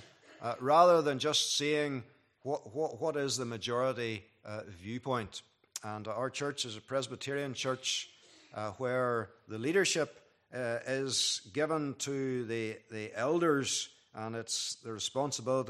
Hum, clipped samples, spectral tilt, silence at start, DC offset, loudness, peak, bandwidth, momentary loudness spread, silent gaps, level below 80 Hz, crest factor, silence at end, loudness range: none; under 0.1%; -3.5 dB/octave; 0 s; under 0.1%; -33 LUFS; -12 dBFS; 14.5 kHz; 15 LU; none; -78 dBFS; 22 dB; 0 s; 7 LU